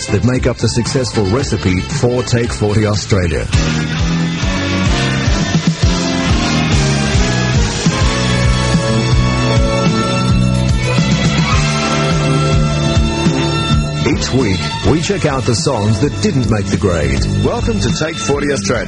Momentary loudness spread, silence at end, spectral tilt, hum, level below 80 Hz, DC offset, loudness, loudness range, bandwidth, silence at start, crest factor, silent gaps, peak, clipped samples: 3 LU; 0 s; -5 dB/octave; none; -22 dBFS; under 0.1%; -14 LUFS; 2 LU; 11.5 kHz; 0 s; 14 dB; none; 0 dBFS; under 0.1%